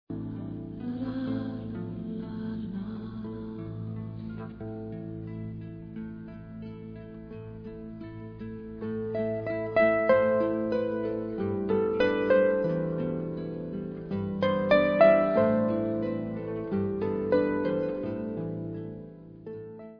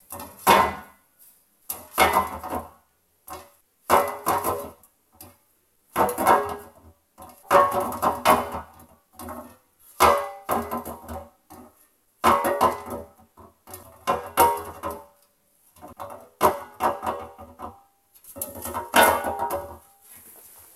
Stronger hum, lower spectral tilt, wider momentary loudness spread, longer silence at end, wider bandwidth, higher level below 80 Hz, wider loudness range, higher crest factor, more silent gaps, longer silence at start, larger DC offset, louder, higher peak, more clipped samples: neither; first, -6 dB/octave vs -3 dB/octave; second, 18 LU vs 22 LU; second, 0 s vs 0.45 s; second, 5.4 kHz vs 16.5 kHz; about the same, -56 dBFS vs -52 dBFS; first, 15 LU vs 5 LU; about the same, 22 dB vs 24 dB; neither; about the same, 0.1 s vs 0.1 s; neither; second, -29 LUFS vs -23 LUFS; second, -8 dBFS vs -2 dBFS; neither